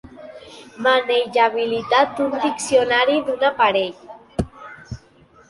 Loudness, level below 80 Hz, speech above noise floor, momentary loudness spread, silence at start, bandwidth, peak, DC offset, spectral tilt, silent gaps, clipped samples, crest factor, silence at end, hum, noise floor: -19 LUFS; -48 dBFS; 33 dB; 22 LU; 0.05 s; 11.5 kHz; -4 dBFS; under 0.1%; -3.5 dB/octave; none; under 0.1%; 16 dB; 0.5 s; none; -51 dBFS